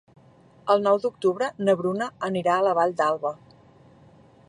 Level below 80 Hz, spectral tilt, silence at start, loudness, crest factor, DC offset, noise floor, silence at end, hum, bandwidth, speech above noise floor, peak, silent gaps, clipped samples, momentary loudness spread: -70 dBFS; -6 dB/octave; 0.65 s; -24 LUFS; 18 dB; under 0.1%; -54 dBFS; 1.15 s; none; 11 kHz; 31 dB; -8 dBFS; none; under 0.1%; 8 LU